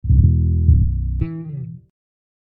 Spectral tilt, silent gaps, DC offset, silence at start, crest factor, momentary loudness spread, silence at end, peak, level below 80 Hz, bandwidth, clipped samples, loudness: -14 dB/octave; none; under 0.1%; 0.05 s; 16 dB; 16 LU; 0.75 s; -2 dBFS; -22 dBFS; 2.6 kHz; under 0.1%; -18 LUFS